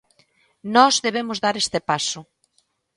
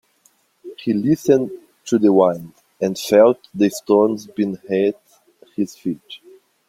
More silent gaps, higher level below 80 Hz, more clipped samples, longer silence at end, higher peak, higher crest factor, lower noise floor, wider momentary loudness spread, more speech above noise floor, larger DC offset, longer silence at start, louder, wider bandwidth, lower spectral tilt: neither; about the same, -64 dBFS vs -62 dBFS; neither; first, 0.75 s vs 0.5 s; about the same, 0 dBFS vs -2 dBFS; about the same, 22 dB vs 18 dB; first, -67 dBFS vs -60 dBFS; second, 12 LU vs 19 LU; first, 47 dB vs 42 dB; neither; about the same, 0.65 s vs 0.65 s; about the same, -20 LUFS vs -18 LUFS; second, 11.5 kHz vs 16.5 kHz; second, -2.5 dB/octave vs -6 dB/octave